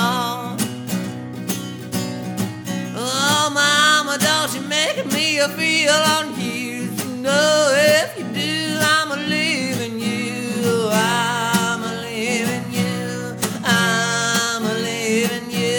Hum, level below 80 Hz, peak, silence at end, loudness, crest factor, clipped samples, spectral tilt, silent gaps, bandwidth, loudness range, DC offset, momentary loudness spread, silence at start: none; -62 dBFS; -2 dBFS; 0 s; -19 LUFS; 18 dB; under 0.1%; -3 dB/octave; none; over 20 kHz; 4 LU; under 0.1%; 11 LU; 0 s